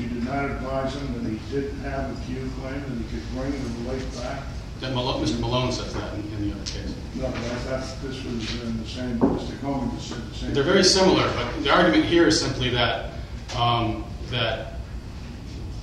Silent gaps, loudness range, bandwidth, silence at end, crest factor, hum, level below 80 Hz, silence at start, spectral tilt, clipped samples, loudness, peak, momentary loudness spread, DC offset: none; 10 LU; 12.5 kHz; 0 s; 22 dB; none; -36 dBFS; 0 s; -4.5 dB/octave; under 0.1%; -25 LUFS; -4 dBFS; 15 LU; under 0.1%